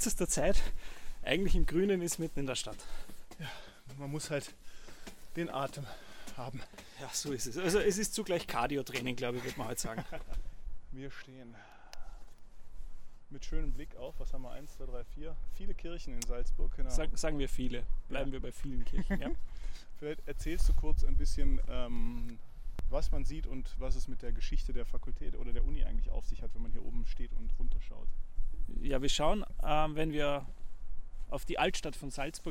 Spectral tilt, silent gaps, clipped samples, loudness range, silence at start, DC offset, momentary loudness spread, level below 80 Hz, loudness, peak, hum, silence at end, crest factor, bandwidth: -4 dB/octave; none; under 0.1%; 12 LU; 0 s; under 0.1%; 19 LU; -36 dBFS; -38 LUFS; -12 dBFS; none; 0 s; 18 dB; 13.5 kHz